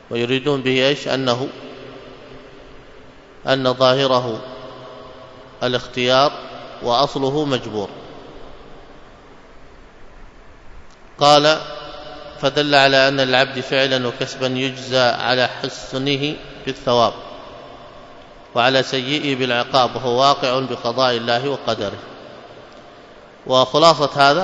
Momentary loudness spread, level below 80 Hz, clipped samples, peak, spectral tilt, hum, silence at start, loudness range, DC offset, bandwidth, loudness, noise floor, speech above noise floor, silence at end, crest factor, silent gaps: 23 LU; -50 dBFS; under 0.1%; 0 dBFS; -4.5 dB/octave; none; 0.1 s; 6 LU; under 0.1%; 11 kHz; -17 LUFS; -42 dBFS; 25 dB; 0 s; 20 dB; none